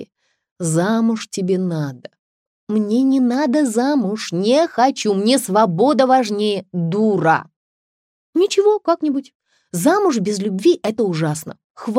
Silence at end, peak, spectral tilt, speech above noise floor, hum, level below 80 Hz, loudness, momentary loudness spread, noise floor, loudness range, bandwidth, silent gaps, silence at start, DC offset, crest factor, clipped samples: 0 s; -2 dBFS; -5.5 dB/octave; 29 dB; none; -72 dBFS; -17 LUFS; 8 LU; -46 dBFS; 3 LU; 16 kHz; 0.51-0.56 s, 2.19-2.67 s, 7.56-8.33 s, 9.35-9.40 s, 11.64-11.75 s; 0 s; under 0.1%; 16 dB; under 0.1%